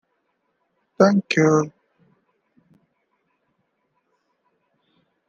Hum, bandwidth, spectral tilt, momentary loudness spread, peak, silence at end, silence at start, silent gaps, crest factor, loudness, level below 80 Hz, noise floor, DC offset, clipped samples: none; 7.8 kHz; -6 dB/octave; 6 LU; -2 dBFS; 3.6 s; 1 s; none; 22 dB; -19 LUFS; -72 dBFS; -72 dBFS; under 0.1%; under 0.1%